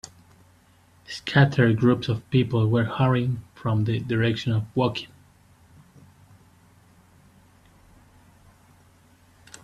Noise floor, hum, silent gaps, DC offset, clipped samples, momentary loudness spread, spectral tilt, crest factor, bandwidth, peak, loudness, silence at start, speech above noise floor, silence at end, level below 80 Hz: -57 dBFS; none; none; under 0.1%; under 0.1%; 14 LU; -7.5 dB/octave; 20 dB; 10.5 kHz; -6 dBFS; -23 LUFS; 1.1 s; 35 dB; 4.55 s; -56 dBFS